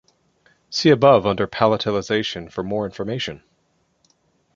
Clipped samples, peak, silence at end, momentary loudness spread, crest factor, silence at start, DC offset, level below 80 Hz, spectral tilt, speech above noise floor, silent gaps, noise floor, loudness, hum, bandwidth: under 0.1%; 0 dBFS; 1.2 s; 13 LU; 20 dB; 0.7 s; under 0.1%; -52 dBFS; -5.5 dB/octave; 47 dB; none; -66 dBFS; -20 LUFS; none; 7.6 kHz